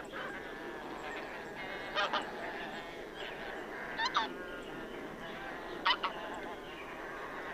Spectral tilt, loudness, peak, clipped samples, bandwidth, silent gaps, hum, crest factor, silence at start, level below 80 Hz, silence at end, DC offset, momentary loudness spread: -3 dB/octave; -39 LUFS; -14 dBFS; under 0.1%; 15.5 kHz; none; none; 26 dB; 0 s; -62 dBFS; 0 s; under 0.1%; 11 LU